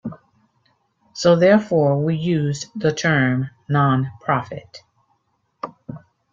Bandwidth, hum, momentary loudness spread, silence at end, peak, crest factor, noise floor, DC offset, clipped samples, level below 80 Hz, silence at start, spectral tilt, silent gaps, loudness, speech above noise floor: 7.6 kHz; none; 20 LU; 0.35 s; -2 dBFS; 18 dB; -68 dBFS; under 0.1%; under 0.1%; -58 dBFS; 0.05 s; -6.5 dB/octave; none; -19 LUFS; 49 dB